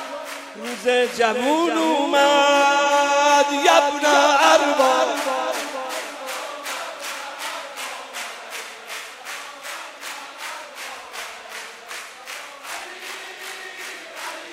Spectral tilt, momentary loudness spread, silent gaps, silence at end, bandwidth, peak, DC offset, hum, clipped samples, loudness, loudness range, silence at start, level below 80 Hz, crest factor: -0.5 dB/octave; 18 LU; none; 0 s; 16 kHz; -2 dBFS; under 0.1%; none; under 0.1%; -19 LUFS; 17 LU; 0 s; -76 dBFS; 20 dB